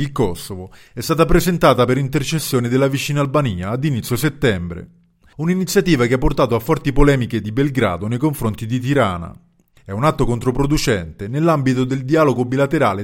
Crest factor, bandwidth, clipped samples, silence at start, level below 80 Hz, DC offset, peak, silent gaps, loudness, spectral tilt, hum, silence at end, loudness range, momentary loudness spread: 18 dB; 17 kHz; under 0.1%; 0 s; -30 dBFS; under 0.1%; 0 dBFS; none; -18 LUFS; -6 dB/octave; none; 0 s; 3 LU; 10 LU